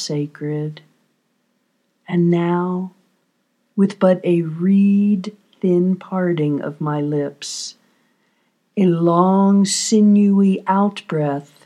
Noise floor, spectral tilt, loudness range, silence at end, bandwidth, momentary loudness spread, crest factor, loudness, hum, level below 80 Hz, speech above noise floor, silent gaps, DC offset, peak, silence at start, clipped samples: -67 dBFS; -6.5 dB/octave; 7 LU; 0.25 s; 11 kHz; 13 LU; 18 dB; -18 LUFS; none; -80 dBFS; 50 dB; none; under 0.1%; 0 dBFS; 0 s; under 0.1%